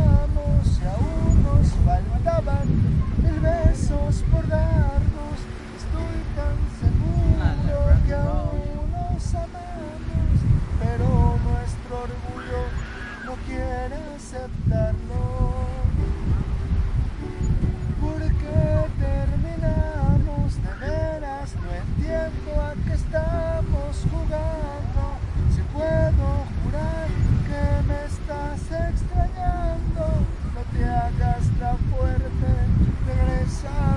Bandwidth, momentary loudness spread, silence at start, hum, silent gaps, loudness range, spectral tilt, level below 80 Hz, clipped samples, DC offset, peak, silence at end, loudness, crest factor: 10.5 kHz; 10 LU; 0 s; none; none; 5 LU; -8 dB/octave; -24 dBFS; under 0.1%; under 0.1%; -2 dBFS; 0 s; -24 LUFS; 18 dB